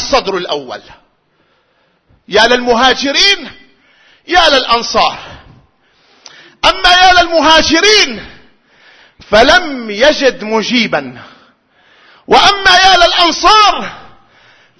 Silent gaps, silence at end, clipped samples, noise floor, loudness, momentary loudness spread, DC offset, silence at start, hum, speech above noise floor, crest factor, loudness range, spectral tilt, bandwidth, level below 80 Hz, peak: none; 0.75 s; 0.4%; -56 dBFS; -8 LUFS; 14 LU; under 0.1%; 0 s; none; 47 dB; 12 dB; 4 LU; -2 dB/octave; 11 kHz; -34 dBFS; 0 dBFS